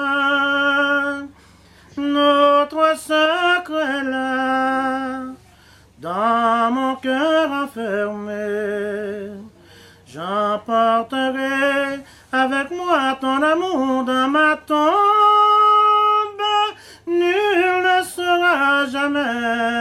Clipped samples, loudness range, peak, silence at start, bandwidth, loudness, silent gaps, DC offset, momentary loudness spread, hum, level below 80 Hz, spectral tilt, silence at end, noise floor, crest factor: under 0.1%; 7 LU; -4 dBFS; 0 s; 14 kHz; -18 LUFS; none; under 0.1%; 12 LU; none; -58 dBFS; -3.5 dB/octave; 0 s; -49 dBFS; 14 dB